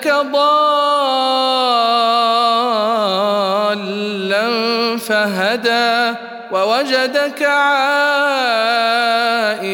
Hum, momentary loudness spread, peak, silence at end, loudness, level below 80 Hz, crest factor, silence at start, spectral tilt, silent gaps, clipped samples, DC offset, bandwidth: none; 4 LU; -2 dBFS; 0 s; -15 LUFS; -72 dBFS; 14 dB; 0 s; -3.5 dB/octave; none; under 0.1%; under 0.1%; 18 kHz